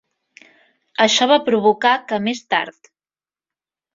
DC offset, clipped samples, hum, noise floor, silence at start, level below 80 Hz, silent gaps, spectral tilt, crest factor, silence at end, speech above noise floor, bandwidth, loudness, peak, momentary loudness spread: under 0.1%; under 0.1%; none; under -90 dBFS; 1 s; -66 dBFS; none; -3 dB/octave; 18 dB; 1.25 s; over 73 dB; 7.8 kHz; -17 LUFS; -2 dBFS; 8 LU